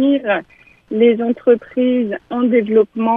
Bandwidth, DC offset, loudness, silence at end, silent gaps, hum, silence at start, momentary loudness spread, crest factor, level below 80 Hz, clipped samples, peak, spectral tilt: 3.7 kHz; under 0.1%; -16 LUFS; 0 s; none; none; 0 s; 7 LU; 14 dB; -58 dBFS; under 0.1%; -2 dBFS; -9 dB/octave